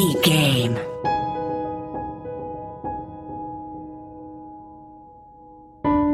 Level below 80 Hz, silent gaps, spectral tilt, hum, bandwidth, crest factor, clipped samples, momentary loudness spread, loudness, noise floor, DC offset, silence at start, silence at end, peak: -48 dBFS; none; -5 dB/octave; none; 16 kHz; 22 dB; under 0.1%; 23 LU; -24 LUFS; -46 dBFS; under 0.1%; 0 s; 0 s; -4 dBFS